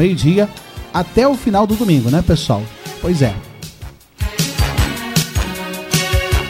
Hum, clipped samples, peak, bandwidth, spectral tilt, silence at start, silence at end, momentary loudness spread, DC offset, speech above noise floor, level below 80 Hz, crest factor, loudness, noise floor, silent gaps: none; under 0.1%; 0 dBFS; 16 kHz; -5.5 dB/octave; 0 s; 0 s; 15 LU; under 0.1%; 21 dB; -26 dBFS; 16 dB; -16 LUFS; -35 dBFS; none